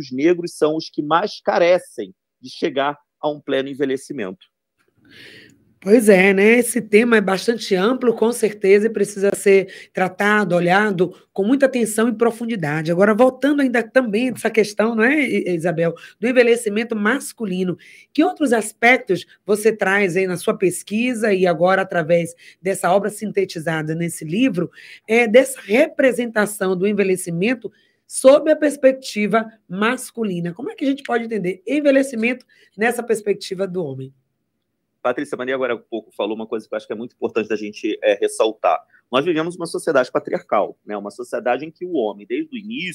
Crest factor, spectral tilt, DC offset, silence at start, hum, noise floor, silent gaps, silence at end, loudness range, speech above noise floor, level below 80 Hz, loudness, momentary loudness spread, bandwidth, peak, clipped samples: 18 dB; -5 dB/octave; under 0.1%; 0 s; none; -74 dBFS; none; 0 s; 7 LU; 55 dB; -72 dBFS; -19 LUFS; 12 LU; 16 kHz; 0 dBFS; under 0.1%